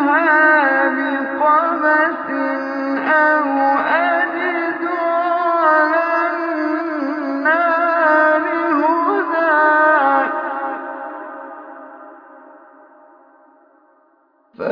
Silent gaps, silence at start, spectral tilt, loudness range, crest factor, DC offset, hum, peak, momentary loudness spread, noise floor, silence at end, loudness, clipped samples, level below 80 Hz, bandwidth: none; 0 s; -6 dB/octave; 8 LU; 16 dB; under 0.1%; none; 0 dBFS; 13 LU; -57 dBFS; 0 s; -16 LUFS; under 0.1%; -78 dBFS; 5.4 kHz